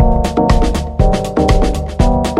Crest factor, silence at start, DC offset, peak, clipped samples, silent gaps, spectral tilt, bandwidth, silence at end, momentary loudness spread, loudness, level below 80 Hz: 12 dB; 0 s; under 0.1%; 0 dBFS; under 0.1%; none; -6.5 dB/octave; 13 kHz; 0 s; 3 LU; -14 LUFS; -16 dBFS